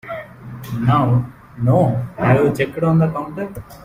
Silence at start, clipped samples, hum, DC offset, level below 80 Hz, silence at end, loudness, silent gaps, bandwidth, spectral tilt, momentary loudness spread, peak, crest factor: 0.05 s; under 0.1%; none; under 0.1%; -46 dBFS; 0 s; -17 LUFS; none; 15.5 kHz; -8.5 dB/octave; 16 LU; -2 dBFS; 16 dB